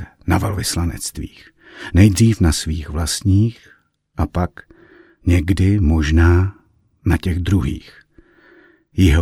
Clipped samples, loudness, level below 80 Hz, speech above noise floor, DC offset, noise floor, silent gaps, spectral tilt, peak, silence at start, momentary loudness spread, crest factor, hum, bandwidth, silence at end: under 0.1%; -18 LUFS; -26 dBFS; 34 dB; under 0.1%; -50 dBFS; none; -6 dB/octave; 0 dBFS; 0 s; 13 LU; 18 dB; none; 15 kHz; 0 s